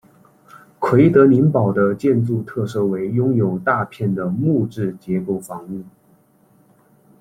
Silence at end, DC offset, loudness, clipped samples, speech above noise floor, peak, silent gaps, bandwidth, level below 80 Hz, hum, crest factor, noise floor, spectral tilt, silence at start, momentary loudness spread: 1.3 s; under 0.1%; -18 LUFS; under 0.1%; 38 dB; -2 dBFS; none; 14 kHz; -56 dBFS; none; 18 dB; -55 dBFS; -9 dB/octave; 0.55 s; 13 LU